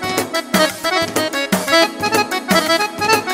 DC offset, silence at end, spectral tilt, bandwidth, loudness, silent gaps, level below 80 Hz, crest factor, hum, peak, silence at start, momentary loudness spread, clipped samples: under 0.1%; 0 s; -3 dB/octave; 16.5 kHz; -16 LUFS; none; -52 dBFS; 16 dB; none; 0 dBFS; 0 s; 4 LU; under 0.1%